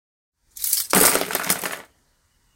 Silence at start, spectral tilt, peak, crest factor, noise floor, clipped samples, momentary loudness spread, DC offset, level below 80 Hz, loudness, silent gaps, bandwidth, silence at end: 0.55 s; -1.5 dB/octave; 0 dBFS; 24 dB; -64 dBFS; under 0.1%; 14 LU; under 0.1%; -54 dBFS; -19 LUFS; none; 17.5 kHz; 0.75 s